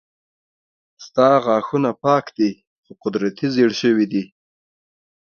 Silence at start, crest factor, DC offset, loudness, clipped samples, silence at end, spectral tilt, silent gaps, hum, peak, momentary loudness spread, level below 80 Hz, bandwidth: 1 s; 20 dB; under 0.1%; -19 LUFS; under 0.1%; 0.95 s; -6.5 dB/octave; 2.67-2.83 s; none; 0 dBFS; 11 LU; -64 dBFS; 6.8 kHz